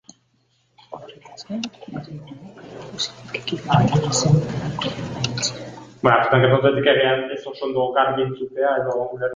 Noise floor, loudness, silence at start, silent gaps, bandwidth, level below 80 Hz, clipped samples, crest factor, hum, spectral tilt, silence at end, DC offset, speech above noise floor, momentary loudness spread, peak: -64 dBFS; -20 LUFS; 0.9 s; none; 9.6 kHz; -52 dBFS; under 0.1%; 20 dB; none; -5 dB/octave; 0 s; under 0.1%; 44 dB; 22 LU; -2 dBFS